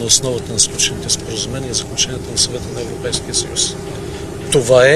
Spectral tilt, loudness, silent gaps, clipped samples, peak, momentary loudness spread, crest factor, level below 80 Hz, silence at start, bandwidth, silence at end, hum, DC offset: -2.5 dB/octave; -17 LUFS; none; under 0.1%; 0 dBFS; 13 LU; 16 dB; -36 dBFS; 0 s; 15 kHz; 0 s; none; under 0.1%